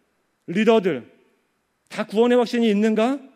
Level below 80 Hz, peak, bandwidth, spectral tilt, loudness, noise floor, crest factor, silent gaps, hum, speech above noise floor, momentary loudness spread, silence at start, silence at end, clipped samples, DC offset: -76 dBFS; -4 dBFS; 11.5 kHz; -6 dB/octave; -20 LUFS; -69 dBFS; 16 dB; none; none; 50 dB; 13 LU; 0.5 s; 0.1 s; under 0.1%; under 0.1%